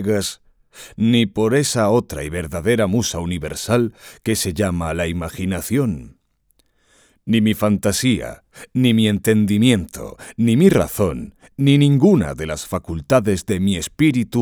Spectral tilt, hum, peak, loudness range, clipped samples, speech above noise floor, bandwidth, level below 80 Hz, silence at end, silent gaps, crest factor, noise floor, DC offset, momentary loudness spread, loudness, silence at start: -5.5 dB/octave; none; 0 dBFS; 5 LU; under 0.1%; 45 dB; over 20 kHz; -42 dBFS; 0 s; none; 18 dB; -63 dBFS; under 0.1%; 12 LU; -18 LUFS; 0 s